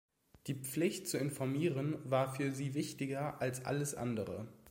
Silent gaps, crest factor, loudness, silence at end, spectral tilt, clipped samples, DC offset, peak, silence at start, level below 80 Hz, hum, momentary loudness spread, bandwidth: none; 18 dB; -38 LUFS; 0 s; -5.5 dB/octave; under 0.1%; under 0.1%; -20 dBFS; 0.45 s; -72 dBFS; none; 7 LU; 16.5 kHz